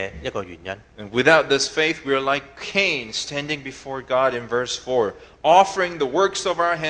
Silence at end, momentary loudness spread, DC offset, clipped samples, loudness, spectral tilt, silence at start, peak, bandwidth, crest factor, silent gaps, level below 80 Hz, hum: 0 s; 15 LU; under 0.1%; under 0.1%; -21 LUFS; -3 dB/octave; 0 s; 0 dBFS; 10 kHz; 22 dB; none; -52 dBFS; none